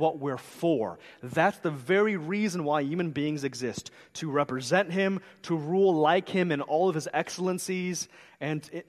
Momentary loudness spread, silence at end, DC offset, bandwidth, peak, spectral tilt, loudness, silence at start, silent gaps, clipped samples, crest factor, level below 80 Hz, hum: 11 LU; 0.05 s; under 0.1%; 13 kHz; -8 dBFS; -5.5 dB/octave; -28 LUFS; 0 s; none; under 0.1%; 20 dB; -72 dBFS; none